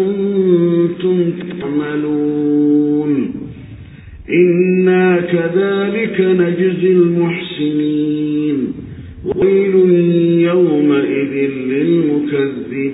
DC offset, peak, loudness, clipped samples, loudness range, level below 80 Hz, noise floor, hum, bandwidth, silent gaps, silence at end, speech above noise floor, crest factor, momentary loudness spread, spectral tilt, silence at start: under 0.1%; -2 dBFS; -14 LUFS; under 0.1%; 3 LU; -46 dBFS; -34 dBFS; none; 4 kHz; none; 0 s; 22 dB; 12 dB; 9 LU; -13 dB/octave; 0 s